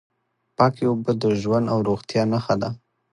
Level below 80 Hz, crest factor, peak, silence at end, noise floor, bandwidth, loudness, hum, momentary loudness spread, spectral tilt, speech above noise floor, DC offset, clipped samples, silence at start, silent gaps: -56 dBFS; 20 dB; -2 dBFS; 0.35 s; -41 dBFS; 10.5 kHz; -22 LUFS; none; 8 LU; -7.5 dB/octave; 20 dB; under 0.1%; under 0.1%; 0.6 s; none